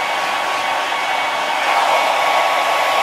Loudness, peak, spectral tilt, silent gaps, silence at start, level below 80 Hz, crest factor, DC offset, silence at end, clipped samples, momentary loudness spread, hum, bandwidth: -16 LUFS; -2 dBFS; -0.5 dB/octave; none; 0 s; -66 dBFS; 14 dB; under 0.1%; 0 s; under 0.1%; 4 LU; none; 16 kHz